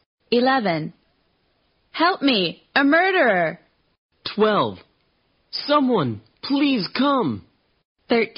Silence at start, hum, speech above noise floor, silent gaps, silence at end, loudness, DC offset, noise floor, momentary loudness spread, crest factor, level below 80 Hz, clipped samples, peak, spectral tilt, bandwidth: 0.3 s; none; 46 dB; 3.98-4.09 s, 7.85-7.95 s; 0.1 s; -20 LUFS; under 0.1%; -66 dBFS; 14 LU; 16 dB; -66 dBFS; under 0.1%; -6 dBFS; -2.5 dB/octave; 5.6 kHz